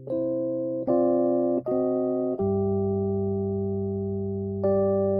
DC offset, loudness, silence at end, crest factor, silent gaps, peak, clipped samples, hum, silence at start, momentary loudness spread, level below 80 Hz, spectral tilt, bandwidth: under 0.1%; -26 LUFS; 0 s; 14 dB; none; -12 dBFS; under 0.1%; none; 0 s; 6 LU; -58 dBFS; -14.5 dB/octave; 2 kHz